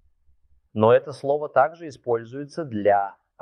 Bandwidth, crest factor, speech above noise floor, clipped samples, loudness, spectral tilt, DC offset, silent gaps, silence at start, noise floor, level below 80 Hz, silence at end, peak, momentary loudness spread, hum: 10 kHz; 20 dB; 38 dB; under 0.1%; -23 LUFS; -7.5 dB/octave; under 0.1%; none; 0.75 s; -60 dBFS; -68 dBFS; 0.3 s; -4 dBFS; 15 LU; none